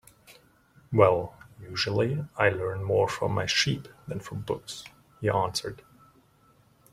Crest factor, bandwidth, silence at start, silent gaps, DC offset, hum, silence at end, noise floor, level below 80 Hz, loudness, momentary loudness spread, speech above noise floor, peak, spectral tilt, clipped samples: 24 dB; 15.5 kHz; 0.3 s; none; under 0.1%; none; 1.2 s; -62 dBFS; -60 dBFS; -27 LUFS; 18 LU; 35 dB; -4 dBFS; -4.5 dB/octave; under 0.1%